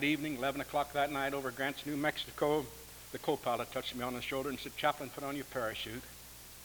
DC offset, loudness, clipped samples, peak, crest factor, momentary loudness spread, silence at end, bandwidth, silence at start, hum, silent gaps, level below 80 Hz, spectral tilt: under 0.1%; -36 LUFS; under 0.1%; -16 dBFS; 20 dB; 12 LU; 0 s; over 20 kHz; 0 s; none; none; -60 dBFS; -4 dB/octave